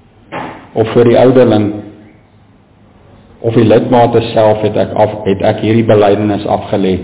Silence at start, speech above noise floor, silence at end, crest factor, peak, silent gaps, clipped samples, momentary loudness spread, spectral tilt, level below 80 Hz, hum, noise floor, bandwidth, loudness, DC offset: 0.3 s; 35 dB; 0 s; 10 dB; 0 dBFS; none; under 0.1%; 14 LU; -11.5 dB/octave; -40 dBFS; none; -44 dBFS; 4 kHz; -10 LUFS; under 0.1%